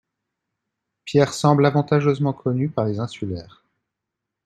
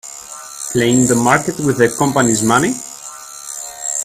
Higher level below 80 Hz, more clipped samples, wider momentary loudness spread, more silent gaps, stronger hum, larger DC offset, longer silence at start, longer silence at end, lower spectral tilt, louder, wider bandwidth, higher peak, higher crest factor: second, -58 dBFS vs -50 dBFS; neither; second, 13 LU vs 18 LU; neither; neither; neither; first, 1.05 s vs 0.05 s; first, 1 s vs 0 s; first, -7 dB/octave vs -4 dB/octave; second, -21 LUFS vs -14 LUFS; second, 12 kHz vs 15.5 kHz; about the same, -2 dBFS vs 0 dBFS; about the same, 20 dB vs 16 dB